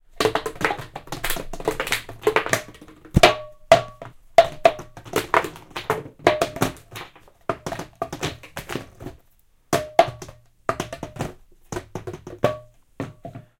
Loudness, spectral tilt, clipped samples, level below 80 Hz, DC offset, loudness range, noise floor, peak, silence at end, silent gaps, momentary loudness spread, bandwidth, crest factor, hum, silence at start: -23 LUFS; -4 dB/octave; under 0.1%; -42 dBFS; under 0.1%; 10 LU; -58 dBFS; 0 dBFS; 0.2 s; none; 20 LU; 17 kHz; 24 dB; none; 0.15 s